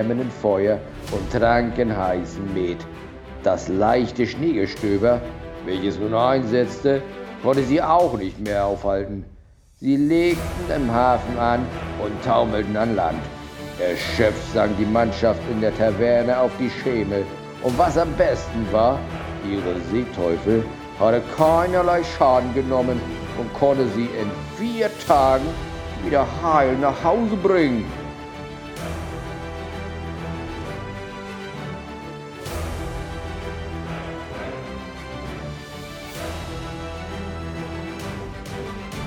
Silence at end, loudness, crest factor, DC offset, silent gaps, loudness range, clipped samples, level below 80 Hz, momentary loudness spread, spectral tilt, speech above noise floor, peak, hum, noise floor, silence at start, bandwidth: 0 s; -22 LUFS; 22 dB; under 0.1%; none; 12 LU; under 0.1%; -38 dBFS; 15 LU; -6.5 dB/octave; 28 dB; 0 dBFS; none; -48 dBFS; 0 s; 19 kHz